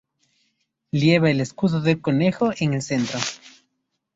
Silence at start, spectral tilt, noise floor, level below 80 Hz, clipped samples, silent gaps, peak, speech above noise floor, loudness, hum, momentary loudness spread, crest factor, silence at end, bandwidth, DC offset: 0.95 s; -6 dB/octave; -76 dBFS; -58 dBFS; under 0.1%; none; -2 dBFS; 55 dB; -21 LUFS; none; 10 LU; 22 dB; 0.65 s; 8 kHz; under 0.1%